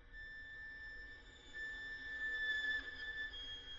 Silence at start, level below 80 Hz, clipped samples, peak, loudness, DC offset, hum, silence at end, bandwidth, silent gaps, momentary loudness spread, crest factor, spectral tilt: 0 s; -62 dBFS; under 0.1%; -32 dBFS; -44 LUFS; under 0.1%; none; 0 s; 7.6 kHz; none; 14 LU; 14 dB; 1 dB/octave